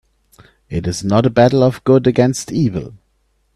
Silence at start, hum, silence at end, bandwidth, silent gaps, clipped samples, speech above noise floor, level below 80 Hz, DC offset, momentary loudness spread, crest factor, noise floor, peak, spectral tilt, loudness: 0.7 s; none; 0.6 s; 13 kHz; none; under 0.1%; 48 dB; -44 dBFS; under 0.1%; 13 LU; 16 dB; -62 dBFS; 0 dBFS; -6.5 dB/octave; -15 LUFS